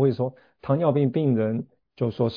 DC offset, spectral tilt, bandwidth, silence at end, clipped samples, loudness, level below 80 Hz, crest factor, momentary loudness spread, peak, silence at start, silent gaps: under 0.1%; -11 dB/octave; 5.2 kHz; 0 s; under 0.1%; -25 LUFS; -62 dBFS; 16 dB; 11 LU; -8 dBFS; 0 s; none